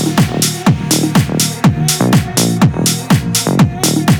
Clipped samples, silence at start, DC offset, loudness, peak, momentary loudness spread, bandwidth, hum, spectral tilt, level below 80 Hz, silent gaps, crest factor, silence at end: under 0.1%; 0 s; under 0.1%; -12 LUFS; 0 dBFS; 2 LU; 19.5 kHz; none; -4.5 dB/octave; -36 dBFS; none; 12 dB; 0 s